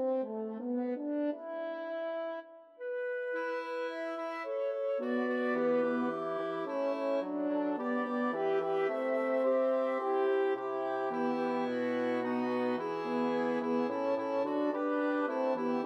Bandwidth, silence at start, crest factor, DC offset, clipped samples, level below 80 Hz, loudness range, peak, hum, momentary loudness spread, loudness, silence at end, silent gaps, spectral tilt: 7.8 kHz; 0 s; 12 dB; under 0.1%; under 0.1%; under -90 dBFS; 6 LU; -20 dBFS; none; 7 LU; -33 LUFS; 0 s; none; -6.5 dB/octave